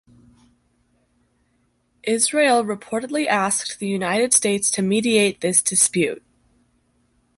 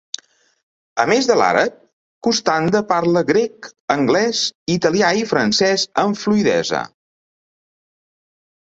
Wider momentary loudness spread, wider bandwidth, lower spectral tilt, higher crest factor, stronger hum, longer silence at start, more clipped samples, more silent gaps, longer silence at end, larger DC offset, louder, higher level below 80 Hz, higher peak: about the same, 9 LU vs 10 LU; first, 12 kHz vs 8 kHz; second, -2.5 dB/octave vs -4 dB/octave; about the same, 20 dB vs 18 dB; neither; first, 2.05 s vs 0.95 s; neither; second, none vs 1.93-2.21 s, 3.80-3.88 s, 4.55-4.66 s; second, 1.2 s vs 1.75 s; neither; about the same, -19 LUFS vs -17 LUFS; second, -64 dBFS vs -58 dBFS; about the same, -2 dBFS vs -2 dBFS